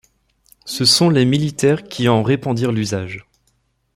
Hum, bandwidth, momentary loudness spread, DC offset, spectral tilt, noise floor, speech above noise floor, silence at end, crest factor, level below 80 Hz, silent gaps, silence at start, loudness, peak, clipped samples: none; 16 kHz; 16 LU; under 0.1%; -5 dB/octave; -64 dBFS; 48 dB; 0.75 s; 16 dB; -52 dBFS; none; 0.65 s; -16 LUFS; -2 dBFS; under 0.1%